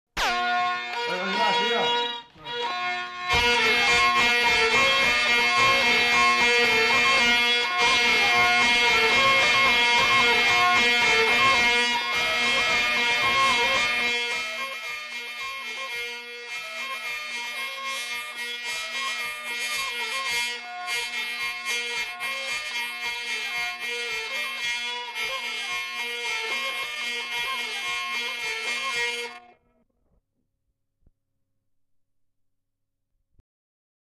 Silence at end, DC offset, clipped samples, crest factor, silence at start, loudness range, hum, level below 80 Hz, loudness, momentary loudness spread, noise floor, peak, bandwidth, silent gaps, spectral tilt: 4.8 s; under 0.1%; under 0.1%; 14 dB; 0.15 s; 12 LU; none; -54 dBFS; -22 LUFS; 12 LU; -78 dBFS; -10 dBFS; 14 kHz; none; -1 dB/octave